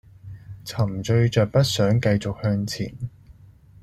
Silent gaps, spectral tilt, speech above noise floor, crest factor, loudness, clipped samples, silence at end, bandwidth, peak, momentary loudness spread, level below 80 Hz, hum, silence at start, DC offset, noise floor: none; -6 dB/octave; 28 dB; 18 dB; -22 LUFS; under 0.1%; 0.5 s; 14 kHz; -6 dBFS; 18 LU; -50 dBFS; none; 0.25 s; under 0.1%; -49 dBFS